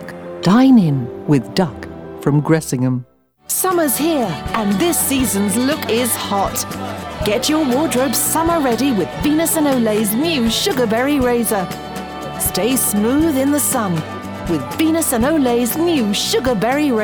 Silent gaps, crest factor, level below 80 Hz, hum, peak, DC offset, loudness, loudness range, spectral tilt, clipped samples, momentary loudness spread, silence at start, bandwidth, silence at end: none; 16 dB; -40 dBFS; none; 0 dBFS; under 0.1%; -16 LUFS; 2 LU; -4.5 dB/octave; under 0.1%; 7 LU; 0 s; over 20 kHz; 0 s